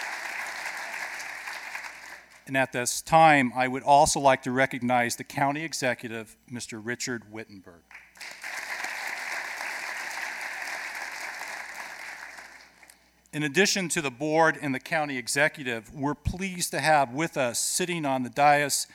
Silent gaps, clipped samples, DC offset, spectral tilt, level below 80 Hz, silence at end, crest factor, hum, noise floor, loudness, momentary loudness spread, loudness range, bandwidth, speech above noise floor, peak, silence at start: none; under 0.1%; under 0.1%; -3 dB/octave; -54 dBFS; 0 s; 22 dB; none; -57 dBFS; -26 LUFS; 17 LU; 12 LU; 17.5 kHz; 31 dB; -6 dBFS; 0 s